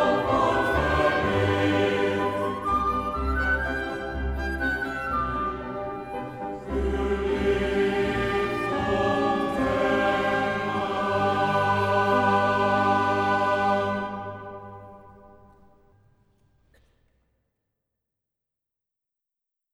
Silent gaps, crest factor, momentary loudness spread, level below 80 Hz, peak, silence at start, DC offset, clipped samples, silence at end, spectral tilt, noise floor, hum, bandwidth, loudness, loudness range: none; 16 dB; 11 LU; -40 dBFS; -10 dBFS; 0 s; under 0.1%; under 0.1%; 4.45 s; -6 dB/octave; -87 dBFS; none; 15 kHz; -25 LUFS; 6 LU